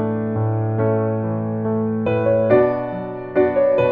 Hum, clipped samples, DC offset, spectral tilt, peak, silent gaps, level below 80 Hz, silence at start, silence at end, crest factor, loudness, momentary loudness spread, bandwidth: none; under 0.1%; under 0.1%; -11 dB/octave; -2 dBFS; none; -50 dBFS; 0 s; 0 s; 16 dB; -19 LUFS; 7 LU; 4.3 kHz